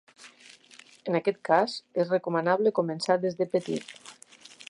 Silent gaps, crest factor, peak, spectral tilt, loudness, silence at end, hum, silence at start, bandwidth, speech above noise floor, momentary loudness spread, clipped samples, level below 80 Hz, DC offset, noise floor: none; 20 dB; -8 dBFS; -5.5 dB/octave; -27 LUFS; 0.6 s; none; 0.2 s; 11.5 kHz; 28 dB; 18 LU; under 0.1%; -80 dBFS; under 0.1%; -54 dBFS